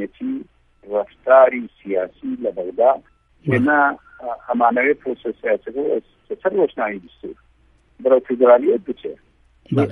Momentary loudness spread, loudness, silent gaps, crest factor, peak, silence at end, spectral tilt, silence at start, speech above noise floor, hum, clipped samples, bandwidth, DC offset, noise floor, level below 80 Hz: 17 LU; -19 LUFS; none; 18 dB; 0 dBFS; 0 s; -9 dB/octave; 0 s; 38 dB; none; under 0.1%; 3.9 kHz; under 0.1%; -56 dBFS; -58 dBFS